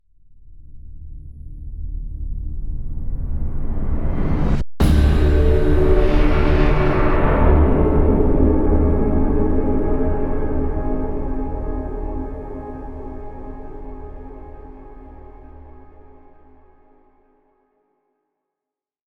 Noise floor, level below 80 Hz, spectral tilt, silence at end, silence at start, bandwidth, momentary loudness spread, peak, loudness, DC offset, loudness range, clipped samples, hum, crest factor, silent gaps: -87 dBFS; -22 dBFS; -9 dB/octave; 3.4 s; 0.45 s; 11.5 kHz; 22 LU; -2 dBFS; -20 LUFS; under 0.1%; 19 LU; under 0.1%; none; 16 dB; none